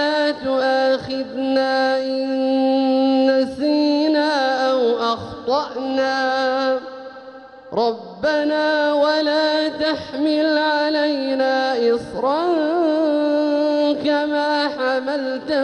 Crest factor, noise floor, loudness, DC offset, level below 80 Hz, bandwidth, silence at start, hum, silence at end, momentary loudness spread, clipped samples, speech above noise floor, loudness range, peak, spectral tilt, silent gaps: 12 dB; -39 dBFS; -19 LUFS; under 0.1%; -60 dBFS; 9.4 kHz; 0 s; none; 0 s; 5 LU; under 0.1%; 20 dB; 3 LU; -6 dBFS; -4.5 dB/octave; none